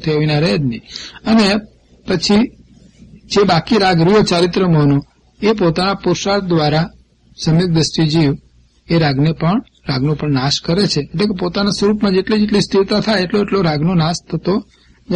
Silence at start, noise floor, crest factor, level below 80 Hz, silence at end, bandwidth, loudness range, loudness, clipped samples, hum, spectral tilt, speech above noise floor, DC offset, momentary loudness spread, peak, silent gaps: 0 s; -43 dBFS; 12 dB; -40 dBFS; 0 s; 10 kHz; 3 LU; -15 LUFS; under 0.1%; none; -6 dB/octave; 29 dB; under 0.1%; 8 LU; -2 dBFS; none